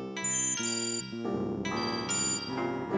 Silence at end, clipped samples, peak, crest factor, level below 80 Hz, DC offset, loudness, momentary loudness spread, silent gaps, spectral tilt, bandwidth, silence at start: 0 s; under 0.1%; -20 dBFS; 12 dB; -60 dBFS; under 0.1%; -30 LUFS; 7 LU; none; -2.5 dB/octave; 8 kHz; 0 s